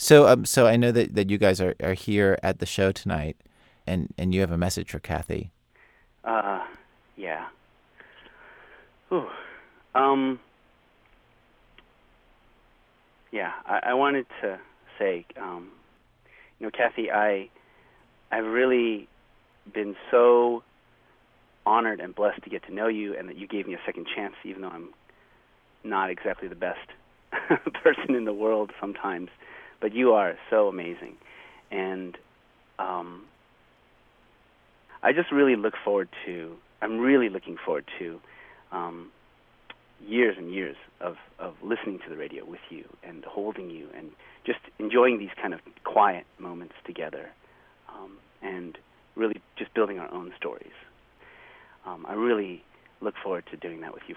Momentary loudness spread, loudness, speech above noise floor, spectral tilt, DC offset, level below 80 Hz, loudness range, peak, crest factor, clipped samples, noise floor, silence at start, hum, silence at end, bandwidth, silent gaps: 20 LU; -26 LUFS; 36 dB; -5.5 dB/octave; under 0.1%; -56 dBFS; 10 LU; -2 dBFS; 26 dB; under 0.1%; -61 dBFS; 0 s; none; 0 s; 17.5 kHz; none